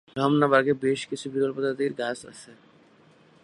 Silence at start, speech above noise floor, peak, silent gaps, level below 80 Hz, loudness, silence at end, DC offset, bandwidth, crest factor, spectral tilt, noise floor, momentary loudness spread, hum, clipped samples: 0.15 s; 32 dB; -6 dBFS; none; -70 dBFS; -25 LUFS; 0.9 s; under 0.1%; 11.5 kHz; 22 dB; -5.5 dB/octave; -57 dBFS; 16 LU; none; under 0.1%